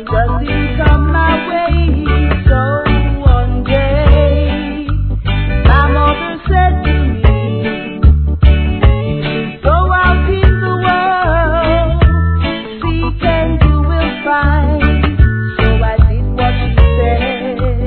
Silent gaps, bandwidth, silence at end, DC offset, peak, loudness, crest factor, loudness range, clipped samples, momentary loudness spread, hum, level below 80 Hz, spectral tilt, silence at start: none; 4.5 kHz; 0 s; 0.3%; 0 dBFS; -13 LUFS; 10 dB; 1 LU; 0.3%; 6 LU; none; -14 dBFS; -10.5 dB/octave; 0 s